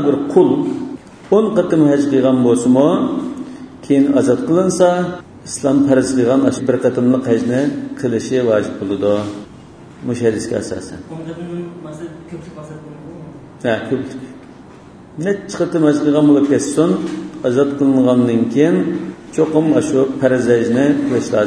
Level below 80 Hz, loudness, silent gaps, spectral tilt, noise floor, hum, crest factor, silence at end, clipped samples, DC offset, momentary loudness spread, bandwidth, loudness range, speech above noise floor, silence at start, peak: -52 dBFS; -15 LUFS; none; -6.5 dB/octave; -39 dBFS; none; 16 dB; 0 s; under 0.1%; under 0.1%; 18 LU; 10.5 kHz; 11 LU; 24 dB; 0 s; 0 dBFS